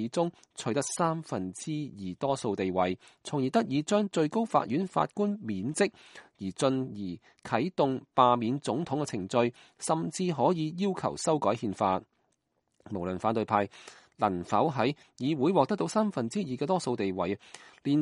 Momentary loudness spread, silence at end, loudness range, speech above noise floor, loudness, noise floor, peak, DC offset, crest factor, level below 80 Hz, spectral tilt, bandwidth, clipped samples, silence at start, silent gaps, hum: 9 LU; 0 s; 3 LU; 47 dB; -30 LUFS; -77 dBFS; -8 dBFS; under 0.1%; 22 dB; -68 dBFS; -5.5 dB/octave; 11.5 kHz; under 0.1%; 0 s; none; none